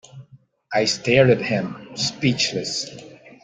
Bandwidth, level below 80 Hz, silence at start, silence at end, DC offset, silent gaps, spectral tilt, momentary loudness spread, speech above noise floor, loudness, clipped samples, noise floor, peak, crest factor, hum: 9.6 kHz; -58 dBFS; 0.15 s; 0.15 s; under 0.1%; none; -4.5 dB/octave; 13 LU; 30 dB; -20 LUFS; under 0.1%; -51 dBFS; -2 dBFS; 20 dB; none